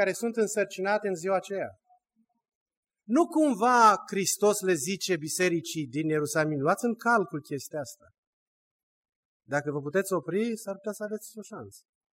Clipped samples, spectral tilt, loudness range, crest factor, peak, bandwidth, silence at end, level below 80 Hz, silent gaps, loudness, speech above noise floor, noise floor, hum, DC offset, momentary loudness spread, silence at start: under 0.1%; -4 dB/octave; 8 LU; 22 dB; -8 dBFS; 16 kHz; 0.35 s; -78 dBFS; 2.55-2.66 s, 2.77-2.83 s, 8.18-9.03 s, 9.16-9.40 s; -27 LUFS; 47 dB; -74 dBFS; none; under 0.1%; 13 LU; 0 s